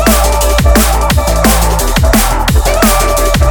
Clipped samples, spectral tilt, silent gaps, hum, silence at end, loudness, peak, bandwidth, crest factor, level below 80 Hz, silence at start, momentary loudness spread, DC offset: 0.3%; -4 dB/octave; none; none; 0 s; -10 LUFS; 0 dBFS; over 20 kHz; 8 dB; -12 dBFS; 0 s; 2 LU; under 0.1%